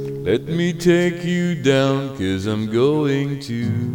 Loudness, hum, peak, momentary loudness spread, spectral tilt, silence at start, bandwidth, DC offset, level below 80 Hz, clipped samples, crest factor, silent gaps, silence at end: -19 LUFS; none; -2 dBFS; 6 LU; -6.5 dB/octave; 0 s; 17 kHz; under 0.1%; -50 dBFS; under 0.1%; 16 dB; none; 0 s